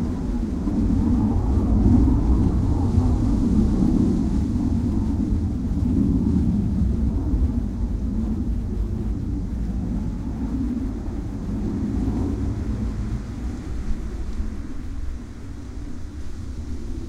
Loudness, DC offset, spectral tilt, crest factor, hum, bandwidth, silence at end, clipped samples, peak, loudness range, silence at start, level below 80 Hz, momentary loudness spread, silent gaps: -24 LUFS; under 0.1%; -9 dB/octave; 16 dB; none; 9.6 kHz; 0 s; under 0.1%; -6 dBFS; 11 LU; 0 s; -26 dBFS; 14 LU; none